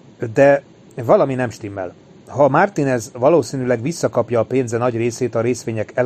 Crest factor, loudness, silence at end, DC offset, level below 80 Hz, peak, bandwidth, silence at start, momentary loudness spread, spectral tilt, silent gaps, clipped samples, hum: 16 dB; -18 LUFS; 0 s; under 0.1%; -56 dBFS; 0 dBFS; 13.5 kHz; 0.2 s; 14 LU; -6.5 dB/octave; none; under 0.1%; none